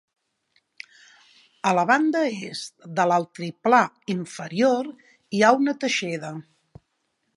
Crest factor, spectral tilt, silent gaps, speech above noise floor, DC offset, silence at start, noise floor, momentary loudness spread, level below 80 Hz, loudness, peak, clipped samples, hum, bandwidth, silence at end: 22 dB; -4.5 dB/octave; none; 51 dB; under 0.1%; 1.65 s; -74 dBFS; 17 LU; -72 dBFS; -23 LUFS; -2 dBFS; under 0.1%; none; 11.5 kHz; 0.95 s